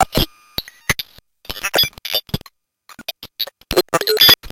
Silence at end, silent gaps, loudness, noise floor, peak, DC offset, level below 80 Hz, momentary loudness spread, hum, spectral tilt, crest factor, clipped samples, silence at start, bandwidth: 0 s; none; -17 LUFS; -48 dBFS; 0 dBFS; under 0.1%; -36 dBFS; 20 LU; none; -2.5 dB/octave; 20 dB; under 0.1%; 0 s; 17 kHz